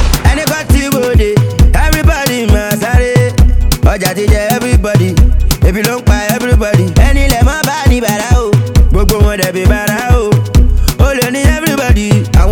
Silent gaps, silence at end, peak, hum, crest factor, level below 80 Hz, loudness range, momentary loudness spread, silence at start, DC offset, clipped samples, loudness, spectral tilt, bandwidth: none; 0 s; 0 dBFS; none; 8 dB; -12 dBFS; 0 LU; 2 LU; 0 s; 0.3%; 2%; -10 LUFS; -5.5 dB/octave; 19 kHz